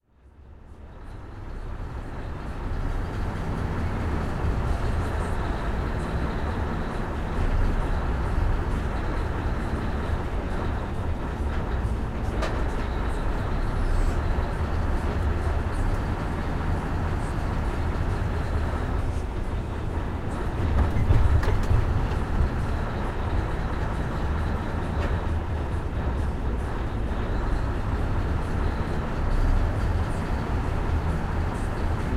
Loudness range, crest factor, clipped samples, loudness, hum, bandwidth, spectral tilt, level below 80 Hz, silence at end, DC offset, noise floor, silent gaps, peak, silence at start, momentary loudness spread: 3 LU; 18 dB; under 0.1%; -28 LUFS; none; 11.5 kHz; -7.5 dB/octave; -28 dBFS; 0 s; under 0.1%; -51 dBFS; none; -8 dBFS; 0.25 s; 5 LU